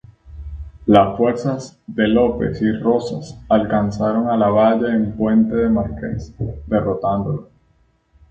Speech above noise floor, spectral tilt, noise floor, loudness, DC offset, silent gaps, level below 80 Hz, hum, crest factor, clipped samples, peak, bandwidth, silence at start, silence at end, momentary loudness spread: 42 dB; -8 dB/octave; -59 dBFS; -18 LUFS; under 0.1%; none; -38 dBFS; none; 18 dB; under 0.1%; 0 dBFS; 7.6 kHz; 0.25 s; 0.9 s; 14 LU